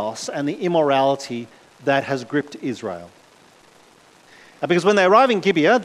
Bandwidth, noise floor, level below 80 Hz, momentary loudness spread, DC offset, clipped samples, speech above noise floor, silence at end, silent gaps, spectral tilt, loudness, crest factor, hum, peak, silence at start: 13 kHz; -51 dBFS; -68 dBFS; 17 LU; under 0.1%; under 0.1%; 32 dB; 0 s; none; -5 dB/octave; -19 LUFS; 18 dB; none; -2 dBFS; 0 s